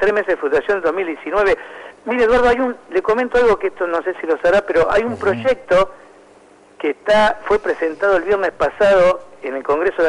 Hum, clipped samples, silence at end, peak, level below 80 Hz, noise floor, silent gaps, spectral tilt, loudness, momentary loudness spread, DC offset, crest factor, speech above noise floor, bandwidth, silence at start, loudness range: none; under 0.1%; 0 s; -8 dBFS; -42 dBFS; -47 dBFS; none; -5 dB/octave; -17 LUFS; 9 LU; under 0.1%; 10 dB; 31 dB; 11 kHz; 0 s; 2 LU